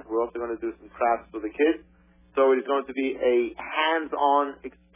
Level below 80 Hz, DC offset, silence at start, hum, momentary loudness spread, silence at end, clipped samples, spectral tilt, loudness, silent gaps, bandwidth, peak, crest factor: -60 dBFS; under 0.1%; 0.05 s; none; 11 LU; 0.25 s; under 0.1%; -7.5 dB/octave; -26 LUFS; none; 3.7 kHz; -10 dBFS; 16 dB